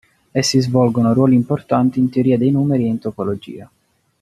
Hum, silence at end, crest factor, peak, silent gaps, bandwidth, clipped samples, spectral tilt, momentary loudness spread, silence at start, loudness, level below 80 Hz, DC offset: none; 0.55 s; 14 dB; -2 dBFS; none; 13 kHz; under 0.1%; -6.5 dB/octave; 10 LU; 0.35 s; -16 LUFS; -54 dBFS; under 0.1%